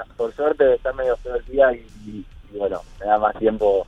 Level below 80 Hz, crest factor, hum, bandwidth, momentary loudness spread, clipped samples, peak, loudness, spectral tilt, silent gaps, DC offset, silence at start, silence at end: -42 dBFS; 18 dB; none; 7.6 kHz; 19 LU; under 0.1%; -4 dBFS; -21 LUFS; -7 dB/octave; none; under 0.1%; 0 s; 0.05 s